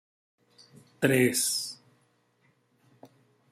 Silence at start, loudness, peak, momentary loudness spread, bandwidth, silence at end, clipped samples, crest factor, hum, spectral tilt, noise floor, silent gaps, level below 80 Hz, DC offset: 1 s; -26 LUFS; -8 dBFS; 15 LU; 16 kHz; 1.75 s; under 0.1%; 26 dB; 60 Hz at -60 dBFS; -3.5 dB/octave; -69 dBFS; none; -72 dBFS; under 0.1%